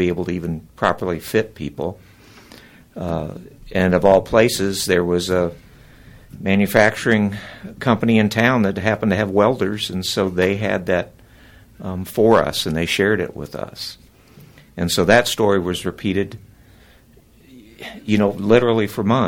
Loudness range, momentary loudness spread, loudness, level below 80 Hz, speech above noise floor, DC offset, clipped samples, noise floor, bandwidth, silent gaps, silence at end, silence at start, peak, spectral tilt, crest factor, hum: 4 LU; 16 LU; -18 LUFS; -46 dBFS; 32 dB; under 0.1%; under 0.1%; -50 dBFS; 18 kHz; none; 0 s; 0 s; 0 dBFS; -5.5 dB/octave; 18 dB; none